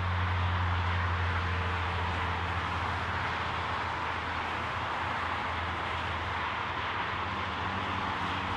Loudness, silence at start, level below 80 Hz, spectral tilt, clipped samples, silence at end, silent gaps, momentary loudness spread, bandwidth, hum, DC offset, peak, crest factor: -32 LUFS; 0 s; -50 dBFS; -5.5 dB/octave; under 0.1%; 0 s; none; 3 LU; 9.8 kHz; none; under 0.1%; -18 dBFS; 12 dB